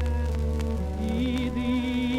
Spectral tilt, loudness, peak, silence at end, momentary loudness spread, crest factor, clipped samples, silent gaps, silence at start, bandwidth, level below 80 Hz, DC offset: -7 dB/octave; -28 LUFS; -14 dBFS; 0 s; 3 LU; 12 dB; under 0.1%; none; 0 s; 11.5 kHz; -30 dBFS; under 0.1%